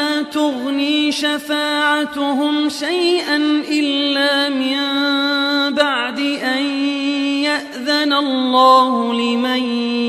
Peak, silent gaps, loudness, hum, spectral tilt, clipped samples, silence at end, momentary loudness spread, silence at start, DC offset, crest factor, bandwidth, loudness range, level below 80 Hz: 0 dBFS; none; -16 LUFS; none; -2.5 dB/octave; under 0.1%; 0 s; 4 LU; 0 s; under 0.1%; 16 dB; 15 kHz; 2 LU; -64 dBFS